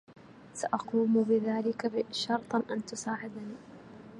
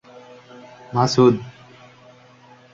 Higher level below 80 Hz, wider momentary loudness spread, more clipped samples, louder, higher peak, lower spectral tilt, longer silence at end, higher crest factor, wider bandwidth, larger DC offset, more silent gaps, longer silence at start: second, -74 dBFS vs -58 dBFS; second, 18 LU vs 25 LU; neither; second, -31 LUFS vs -18 LUFS; second, -14 dBFS vs -2 dBFS; second, -5 dB/octave vs -6.5 dB/octave; second, 0 s vs 1.25 s; about the same, 18 dB vs 20 dB; first, 11 kHz vs 7.6 kHz; neither; neither; second, 0.1 s vs 0.9 s